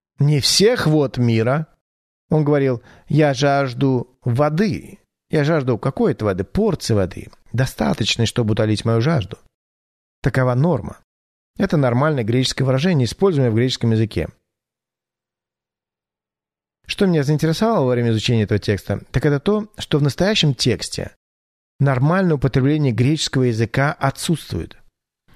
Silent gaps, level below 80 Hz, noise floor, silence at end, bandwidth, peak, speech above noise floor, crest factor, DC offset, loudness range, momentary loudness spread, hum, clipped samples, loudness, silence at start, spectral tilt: 1.81-2.29 s, 9.54-10.22 s, 11.04-11.54 s, 21.16-21.79 s; -44 dBFS; under -90 dBFS; 0.7 s; 13.5 kHz; -4 dBFS; over 72 dB; 16 dB; under 0.1%; 3 LU; 7 LU; none; under 0.1%; -19 LUFS; 0.2 s; -6 dB/octave